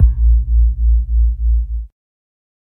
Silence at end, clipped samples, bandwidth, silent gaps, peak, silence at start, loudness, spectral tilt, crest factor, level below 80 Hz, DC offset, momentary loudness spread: 0.9 s; under 0.1%; 0.3 kHz; none; 0 dBFS; 0 s; -17 LUFS; -12.5 dB/octave; 14 dB; -14 dBFS; under 0.1%; 12 LU